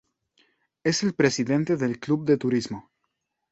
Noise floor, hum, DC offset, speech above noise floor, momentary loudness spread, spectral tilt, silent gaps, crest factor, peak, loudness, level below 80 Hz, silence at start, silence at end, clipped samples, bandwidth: -78 dBFS; none; under 0.1%; 55 dB; 7 LU; -5 dB/octave; none; 20 dB; -6 dBFS; -24 LUFS; -62 dBFS; 0.85 s; 0.7 s; under 0.1%; 8.2 kHz